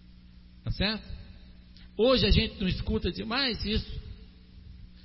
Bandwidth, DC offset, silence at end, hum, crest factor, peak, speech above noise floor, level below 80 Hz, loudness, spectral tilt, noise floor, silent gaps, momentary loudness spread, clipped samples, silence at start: 5.8 kHz; under 0.1%; 0.05 s; 60 Hz at -50 dBFS; 20 dB; -10 dBFS; 24 dB; -38 dBFS; -28 LUFS; -9 dB/octave; -52 dBFS; none; 22 LU; under 0.1%; 0.1 s